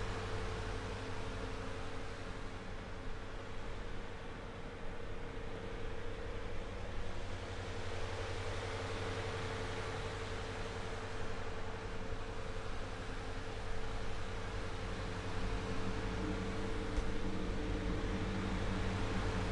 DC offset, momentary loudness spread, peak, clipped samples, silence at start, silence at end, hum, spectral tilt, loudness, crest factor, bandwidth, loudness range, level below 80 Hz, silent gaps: under 0.1%; 8 LU; -24 dBFS; under 0.1%; 0 s; 0 s; none; -5.5 dB/octave; -43 LUFS; 16 dB; 11 kHz; 7 LU; -44 dBFS; none